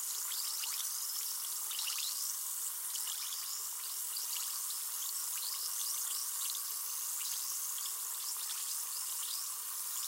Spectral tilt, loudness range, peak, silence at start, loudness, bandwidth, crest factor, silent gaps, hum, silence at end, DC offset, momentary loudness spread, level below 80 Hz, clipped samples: 5.5 dB/octave; 1 LU; -22 dBFS; 0 s; -36 LUFS; 16.5 kHz; 18 dB; none; none; 0 s; under 0.1%; 2 LU; under -90 dBFS; under 0.1%